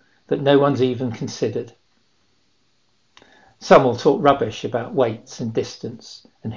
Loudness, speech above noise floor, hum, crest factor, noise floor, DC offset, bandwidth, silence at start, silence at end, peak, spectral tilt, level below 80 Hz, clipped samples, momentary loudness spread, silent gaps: -19 LUFS; 46 dB; none; 20 dB; -66 dBFS; 0.1%; 7.6 kHz; 0.3 s; 0 s; 0 dBFS; -6 dB/octave; -56 dBFS; under 0.1%; 20 LU; none